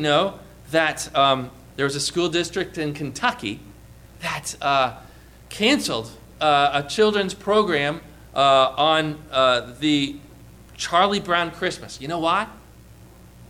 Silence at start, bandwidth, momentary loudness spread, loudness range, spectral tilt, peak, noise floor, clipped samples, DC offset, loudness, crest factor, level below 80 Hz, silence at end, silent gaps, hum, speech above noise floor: 0 s; 16 kHz; 12 LU; 5 LU; -3.5 dB/octave; -6 dBFS; -46 dBFS; under 0.1%; under 0.1%; -21 LUFS; 16 dB; -50 dBFS; 0.05 s; none; none; 25 dB